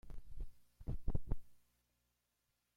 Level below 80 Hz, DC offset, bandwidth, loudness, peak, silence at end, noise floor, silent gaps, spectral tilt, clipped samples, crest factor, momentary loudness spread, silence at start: -48 dBFS; under 0.1%; 2.1 kHz; -49 LUFS; -22 dBFS; 1.2 s; -85 dBFS; none; -9 dB/octave; under 0.1%; 20 dB; 12 LU; 0.05 s